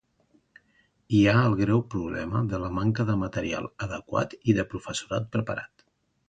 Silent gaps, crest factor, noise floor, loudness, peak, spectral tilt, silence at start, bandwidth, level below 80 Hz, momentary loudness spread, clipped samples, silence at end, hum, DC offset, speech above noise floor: none; 20 dB; -67 dBFS; -27 LUFS; -8 dBFS; -6.5 dB/octave; 1.1 s; 9.2 kHz; -50 dBFS; 12 LU; under 0.1%; 0.65 s; none; under 0.1%; 42 dB